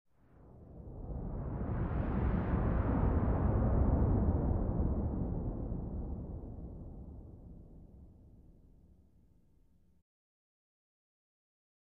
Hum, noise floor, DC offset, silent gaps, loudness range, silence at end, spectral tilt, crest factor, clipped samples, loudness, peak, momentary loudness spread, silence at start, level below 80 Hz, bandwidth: none; -68 dBFS; under 0.1%; none; 19 LU; 3.55 s; -11 dB/octave; 18 dB; under 0.1%; -35 LUFS; -18 dBFS; 21 LU; 0.4 s; -40 dBFS; 3.3 kHz